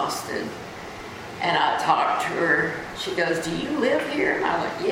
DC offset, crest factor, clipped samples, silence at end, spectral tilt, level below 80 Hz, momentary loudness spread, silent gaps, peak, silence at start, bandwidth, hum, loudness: under 0.1%; 18 dB; under 0.1%; 0 s; -4 dB/octave; -56 dBFS; 15 LU; none; -6 dBFS; 0 s; 16.5 kHz; none; -23 LUFS